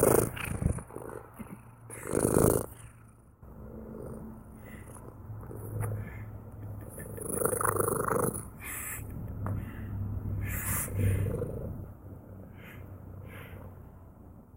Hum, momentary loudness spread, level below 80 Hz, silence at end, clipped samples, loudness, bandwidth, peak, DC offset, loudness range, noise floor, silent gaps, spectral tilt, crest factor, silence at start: none; 20 LU; -46 dBFS; 0 s; under 0.1%; -33 LUFS; 17 kHz; -10 dBFS; under 0.1%; 10 LU; -55 dBFS; none; -6 dB/octave; 24 dB; 0 s